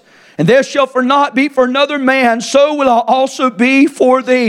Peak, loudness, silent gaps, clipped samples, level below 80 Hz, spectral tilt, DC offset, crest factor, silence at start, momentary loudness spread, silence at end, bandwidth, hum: 0 dBFS; -11 LUFS; none; under 0.1%; -56 dBFS; -4.5 dB/octave; under 0.1%; 12 dB; 0.4 s; 4 LU; 0 s; 12.5 kHz; none